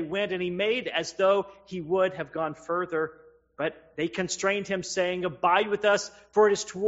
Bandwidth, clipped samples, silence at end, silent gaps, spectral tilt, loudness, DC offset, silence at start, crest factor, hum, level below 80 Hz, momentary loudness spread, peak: 8 kHz; under 0.1%; 0 s; none; -2.5 dB/octave; -27 LUFS; under 0.1%; 0 s; 20 dB; none; -66 dBFS; 9 LU; -8 dBFS